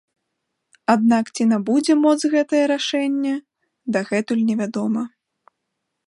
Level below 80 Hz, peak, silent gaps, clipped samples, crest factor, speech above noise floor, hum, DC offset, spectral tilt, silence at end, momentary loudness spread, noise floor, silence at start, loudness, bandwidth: -72 dBFS; -2 dBFS; none; under 0.1%; 18 dB; 59 dB; none; under 0.1%; -5 dB/octave; 1 s; 9 LU; -78 dBFS; 0.9 s; -20 LUFS; 11 kHz